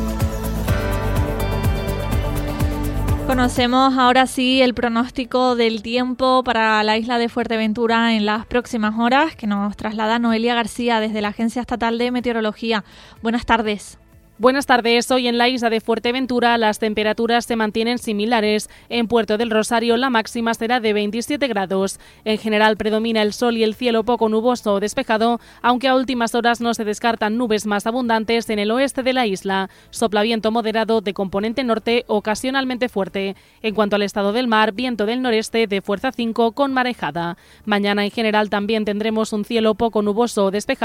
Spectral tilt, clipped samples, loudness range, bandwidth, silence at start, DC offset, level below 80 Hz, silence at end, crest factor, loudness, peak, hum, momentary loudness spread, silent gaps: -5 dB/octave; under 0.1%; 3 LU; 16.5 kHz; 0 s; under 0.1%; -36 dBFS; 0 s; 18 dB; -19 LUFS; -2 dBFS; none; 6 LU; none